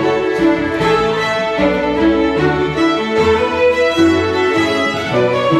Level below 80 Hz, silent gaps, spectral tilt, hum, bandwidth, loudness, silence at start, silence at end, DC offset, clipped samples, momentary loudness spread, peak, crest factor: -38 dBFS; none; -5.5 dB/octave; none; 12 kHz; -14 LUFS; 0 s; 0 s; under 0.1%; under 0.1%; 3 LU; -2 dBFS; 12 dB